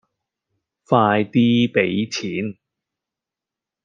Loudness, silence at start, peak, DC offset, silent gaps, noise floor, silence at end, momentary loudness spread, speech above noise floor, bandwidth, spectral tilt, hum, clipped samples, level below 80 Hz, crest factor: -19 LUFS; 0.9 s; -2 dBFS; under 0.1%; none; -87 dBFS; 1.3 s; 10 LU; 69 dB; 7.4 kHz; -6 dB/octave; none; under 0.1%; -64 dBFS; 20 dB